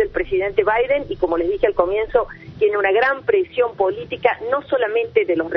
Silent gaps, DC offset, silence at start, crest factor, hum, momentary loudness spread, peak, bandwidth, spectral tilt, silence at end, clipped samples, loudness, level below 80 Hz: none; under 0.1%; 0 s; 18 dB; none; 4 LU; -2 dBFS; 5.6 kHz; -7.5 dB/octave; 0 s; under 0.1%; -19 LUFS; -42 dBFS